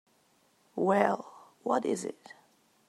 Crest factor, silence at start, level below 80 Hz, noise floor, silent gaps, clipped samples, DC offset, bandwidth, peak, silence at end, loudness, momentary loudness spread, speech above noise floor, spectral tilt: 24 dB; 0.75 s; -86 dBFS; -68 dBFS; none; under 0.1%; under 0.1%; 14 kHz; -10 dBFS; 0.75 s; -31 LUFS; 19 LU; 39 dB; -5.5 dB/octave